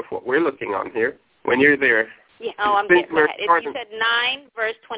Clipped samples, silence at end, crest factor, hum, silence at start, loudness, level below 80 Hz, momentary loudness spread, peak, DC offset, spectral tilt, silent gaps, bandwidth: under 0.1%; 0 s; 18 dB; none; 0 s; -19 LUFS; -60 dBFS; 12 LU; -2 dBFS; under 0.1%; -7.5 dB/octave; none; 4 kHz